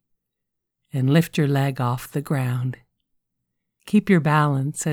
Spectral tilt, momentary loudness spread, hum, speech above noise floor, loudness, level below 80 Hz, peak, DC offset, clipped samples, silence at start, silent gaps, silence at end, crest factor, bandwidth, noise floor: -6.5 dB/octave; 10 LU; none; 61 dB; -22 LUFS; -60 dBFS; -6 dBFS; under 0.1%; under 0.1%; 0.95 s; none; 0 s; 18 dB; 19 kHz; -81 dBFS